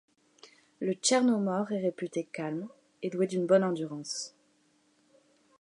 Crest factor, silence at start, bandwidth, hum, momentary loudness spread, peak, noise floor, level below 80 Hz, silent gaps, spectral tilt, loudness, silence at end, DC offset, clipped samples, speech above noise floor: 20 dB; 0.45 s; 11 kHz; none; 13 LU; -12 dBFS; -69 dBFS; -84 dBFS; none; -4.5 dB/octave; -30 LUFS; 1.35 s; under 0.1%; under 0.1%; 39 dB